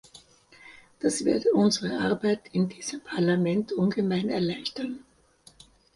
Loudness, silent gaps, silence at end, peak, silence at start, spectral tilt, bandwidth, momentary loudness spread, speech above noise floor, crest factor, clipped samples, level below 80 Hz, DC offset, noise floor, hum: -27 LUFS; none; 1 s; -12 dBFS; 0.15 s; -5.5 dB/octave; 11.5 kHz; 10 LU; 32 dB; 16 dB; under 0.1%; -64 dBFS; under 0.1%; -58 dBFS; none